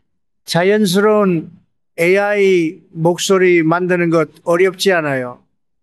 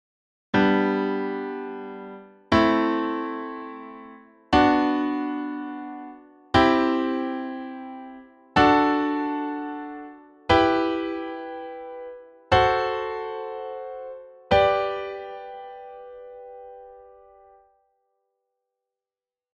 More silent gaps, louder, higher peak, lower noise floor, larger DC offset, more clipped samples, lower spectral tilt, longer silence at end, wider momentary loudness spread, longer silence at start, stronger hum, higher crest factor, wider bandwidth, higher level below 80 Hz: neither; first, -14 LUFS vs -23 LUFS; first, 0 dBFS vs -4 dBFS; second, -41 dBFS vs under -90 dBFS; neither; neither; second, -5 dB/octave vs -6.5 dB/octave; second, 0.5 s vs 2.5 s; second, 9 LU vs 22 LU; about the same, 0.5 s vs 0.55 s; neither; second, 14 dB vs 22 dB; first, 13.5 kHz vs 8.4 kHz; second, -68 dBFS vs -48 dBFS